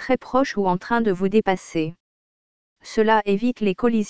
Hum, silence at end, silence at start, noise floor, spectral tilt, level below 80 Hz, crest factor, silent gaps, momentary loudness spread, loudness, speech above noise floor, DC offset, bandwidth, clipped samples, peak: none; 0 s; 0 s; under -90 dBFS; -6.5 dB/octave; -54 dBFS; 18 dB; 2.00-2.76 s; 8 LU; -21 LUFS; over 69 dB; 1%; 8 kHz; under 0.1%; -4 dBFS